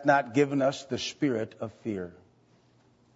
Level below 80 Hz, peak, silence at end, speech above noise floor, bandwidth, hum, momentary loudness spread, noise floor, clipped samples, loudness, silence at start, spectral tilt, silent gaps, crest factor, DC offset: -72 dBFS; -8 dBFS; 1.05 s; 35 dB; 8 kHz; none; 13 LU; -63 dBFS; under 0.1%; -29 LUFS; 0 s; -5.5 dB/octave; none; 20 dB; under 0.1%